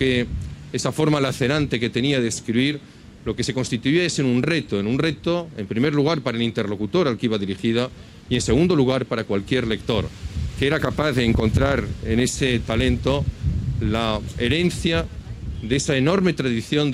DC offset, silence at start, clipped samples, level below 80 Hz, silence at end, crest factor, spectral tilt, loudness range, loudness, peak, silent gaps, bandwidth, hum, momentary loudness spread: under 0.1%; 0 s; under 0.1%; -36 dBFS; 0 s; 16 dB; -5.5 dB/octave; 1 LU; -22 LUFS; -6 dBFS; none; 15 kHz; none; 7 LU